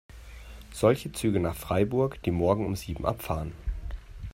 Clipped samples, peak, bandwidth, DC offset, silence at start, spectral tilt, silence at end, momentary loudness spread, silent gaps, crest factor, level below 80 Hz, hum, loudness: under 0.1%; -8 dBFS; 16 kHz; under 0.1%; 0.1 s; -6.5 dB/octave; 0.05 s; 18 LU; none; 20 dB; -42 dBFS; none; -28 LUFS